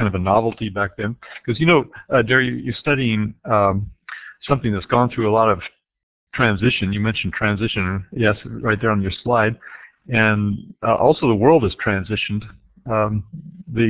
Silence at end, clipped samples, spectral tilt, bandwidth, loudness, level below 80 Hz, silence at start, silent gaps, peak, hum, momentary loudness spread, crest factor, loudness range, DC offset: 0 s; under 0.1%; -10.5 dB/octave; 4 kHz; -19 LUFS; -42 dBFS; 0 s; 6.03-6.27 s; 0 dBFS; none; 13 LU; 18 dB; 2 LU; under 0.1%